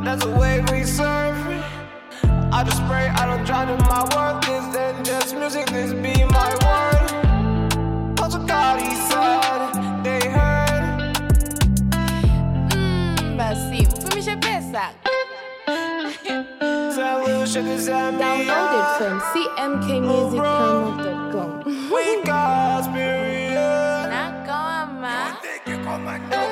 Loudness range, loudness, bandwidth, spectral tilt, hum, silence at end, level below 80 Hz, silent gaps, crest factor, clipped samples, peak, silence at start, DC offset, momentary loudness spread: 4 LU; -21 LUFS; 16.5 kHz; -5 dB/octave; none; 0 s; -28 dBFS; none; 14 dB; under 0.1%; -6 dBFS; 0 s; under 0.1%; 8 LU